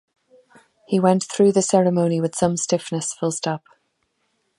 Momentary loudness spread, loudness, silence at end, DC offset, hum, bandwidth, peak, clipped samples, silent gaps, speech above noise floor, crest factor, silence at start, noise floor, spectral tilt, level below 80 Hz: 9 LU; -20 LUFS; 1 s; under 0.1%; none; 11.5 kHz; -2 dBFS; under 0.1%; none; 51 dB; 18 dB; 0.9 s; -70 dBFS; -5.5 dB/octave; -62 dBFS